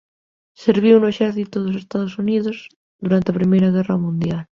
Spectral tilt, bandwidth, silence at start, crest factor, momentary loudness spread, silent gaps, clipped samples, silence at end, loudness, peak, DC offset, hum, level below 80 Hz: -8.5 dB/octave; 7 kHz; 0.6 s; 16 dB; 10 LU; 2.76-2.99 s; under 0.1%; 0.15 s; -18 LUFS; -2 dBFS; under 0.1%; none; -54 dBFS